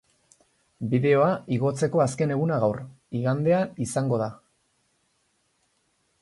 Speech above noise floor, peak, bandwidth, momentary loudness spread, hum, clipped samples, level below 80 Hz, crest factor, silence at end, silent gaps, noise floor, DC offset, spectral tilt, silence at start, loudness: 47 dB; -8 dBFS; 11.5 kHz; 9 LU; none; under 0.1%; -62 dBFS; 18 dB; 1.85 s; none; -70 dBFS; under 0.1%; -7 dB/octave; 0.8 s; -25 LUFS